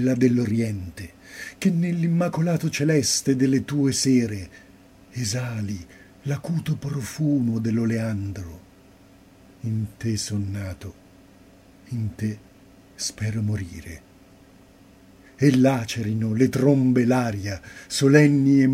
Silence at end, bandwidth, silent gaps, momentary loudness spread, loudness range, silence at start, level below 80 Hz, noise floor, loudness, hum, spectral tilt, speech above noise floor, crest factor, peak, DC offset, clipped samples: 0 s; 15.5 kHz; none; 18 LU; 10 LU; 0 s; -54 dBFS; -51 dBFS; -23 LUFS; none; -6 dB/octave; 29 dB; 22 dB; 0 dBFS; under 0.1%; under 0.1%